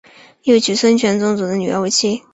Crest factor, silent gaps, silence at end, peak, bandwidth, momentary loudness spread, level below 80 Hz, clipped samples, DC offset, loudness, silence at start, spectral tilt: 14 dB; none; 0.15 s; -2 dBFS; 8.2 kHz; 5 LU; -58 dBFS; under 0.1%; under 0.1%; -15 LUFS; 0.45 s; -4 dB/octave